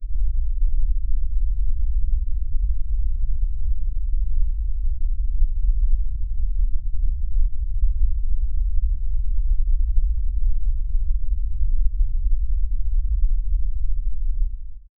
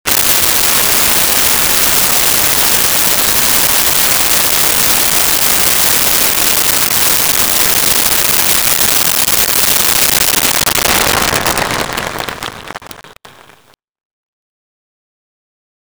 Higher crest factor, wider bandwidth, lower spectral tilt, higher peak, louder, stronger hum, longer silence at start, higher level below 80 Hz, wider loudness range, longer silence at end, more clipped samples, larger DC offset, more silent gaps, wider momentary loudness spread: about the same, 12 dB vs 12 dB; second, 0.2 kHz vs over 20 kHz; first, -15 dB/octave vs -0.5 dB/octave; second, -6 dBFS vs 0 dBFS; second, -27 LUFS vs -8 LUFS; neither; about the same, 0 s vs 0.05 s; first, -20 dBFS vs -36 dBFS; second, 1 LU vs 8 LU; second, 0.2 s vs 2.75 s; neither; neither; neither; about the same, 4 LU vs 6 LU